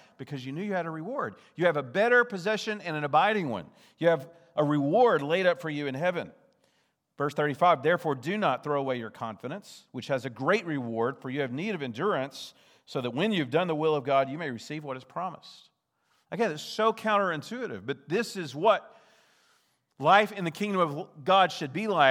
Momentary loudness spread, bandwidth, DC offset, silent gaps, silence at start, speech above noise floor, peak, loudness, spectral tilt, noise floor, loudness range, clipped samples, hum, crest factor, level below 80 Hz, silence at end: 14 LU; 15.5 kHz; under 0.1%; none; 0.2 s; 45 dB; -6 dBFS; -28 LUFS; -5.5 dB/octave; -73 dBFS; 5 LU; under 0.1%; none; 22 dB; -84 dBFS; 0 s